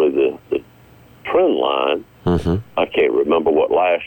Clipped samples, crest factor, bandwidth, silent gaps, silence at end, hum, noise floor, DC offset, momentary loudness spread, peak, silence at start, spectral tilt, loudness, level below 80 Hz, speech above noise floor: under 0.1%; 10 dB; 17 kHz; none; 0 s; none; -46 dBFS; under 0.1%; 9 LU; -6 dBFS; 0 s; -7.5 dB/octave; -18 LUFS; -42 dBFS; 29 dB